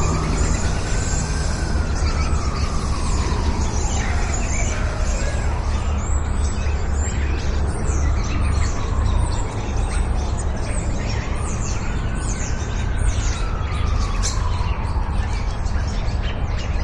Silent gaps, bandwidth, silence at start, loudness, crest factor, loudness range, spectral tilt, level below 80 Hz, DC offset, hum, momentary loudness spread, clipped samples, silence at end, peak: none; 11 kHz; 0 s; -23 LUFS; 12 dB; 2 LU; -5 dB/octave; -22 dBFS; under 0.1%; none; 3 LU; under 0.1%; 0 s; -8 dBFS